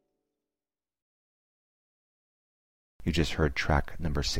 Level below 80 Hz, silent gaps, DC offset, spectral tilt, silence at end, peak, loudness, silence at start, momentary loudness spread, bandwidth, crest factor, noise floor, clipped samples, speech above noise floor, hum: -40 dBFS; 1.02-2.99 s; under 0.1%; -5 dB/octave; 0 s; -12 dBFS; -30 LUFS; 0 s; 6 LU; 16 kHz; 20 dB; under -90 dBFS; under 0.1%; over 62 dB; none